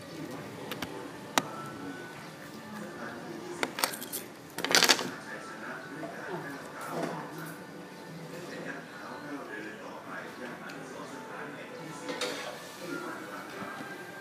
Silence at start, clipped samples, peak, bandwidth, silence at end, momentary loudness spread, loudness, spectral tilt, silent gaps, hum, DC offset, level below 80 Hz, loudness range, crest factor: 0 s; under 0.1%; 0 dBFS; 15.5 kHz; 0 s; 12 LU; -35 LUFS; -2 dB/octave; none; none; under 0.1%; -76 dBFS; 12 LU; 36 dB